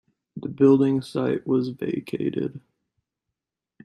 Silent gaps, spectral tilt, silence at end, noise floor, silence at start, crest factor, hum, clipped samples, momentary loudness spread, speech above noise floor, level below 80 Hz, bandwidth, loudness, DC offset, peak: none; -8.5 dB/octave; 1.25 s; -86 dBFS; 0.35 s; 20 dB; none; under 0.1%; 17 LU; 63 dB; -66 dBFS; 11.5 kHz; -23 LUFS; under 0.1%; -6 dBFS